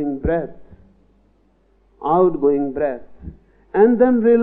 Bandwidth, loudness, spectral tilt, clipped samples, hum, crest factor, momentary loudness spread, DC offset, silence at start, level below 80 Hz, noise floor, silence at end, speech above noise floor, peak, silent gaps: 3.8 kHz; -18 LUFS; -12 dB/octave; under 0.1%; none; 16 dB; 22 LU; under 0.1%; 0 s; -40 dBFS; -58 dBFS; 0 s; 41 dB; -2 dBFS; none